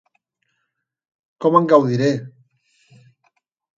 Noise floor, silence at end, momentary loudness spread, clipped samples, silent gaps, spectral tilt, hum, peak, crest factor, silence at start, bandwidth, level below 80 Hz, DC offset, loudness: -76 dBFS; 1.5 s; 9 LU; under 0.1%; none; -7.5 dB/octave; none; 0 dBFS; 20 dB; 1.4 s; 7.6 kHz; -68 dBFS; under 0.1%; -17 LUFS